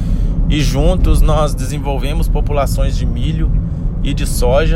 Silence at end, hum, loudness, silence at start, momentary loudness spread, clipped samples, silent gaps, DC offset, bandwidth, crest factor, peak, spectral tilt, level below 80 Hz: 0 s; none; -16 LUFS; 0 s; 6 LU; under 0.1%; none; under 0.1%; 14 kHz; 12 dB; 0 dBFS; -6 dB/octave; -14 dBFS